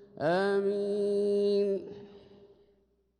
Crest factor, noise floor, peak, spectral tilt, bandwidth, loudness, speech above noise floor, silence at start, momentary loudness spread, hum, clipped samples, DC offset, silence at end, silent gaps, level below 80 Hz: 12 dB; -70 dBFS; -20 dBFS; -7 dB/octave; 10 kHz; -29 LUFS; 41 dB; 0 s; 10 LU; none; under 0.1%; under 0.1%; 1 s; none; -74 dBFS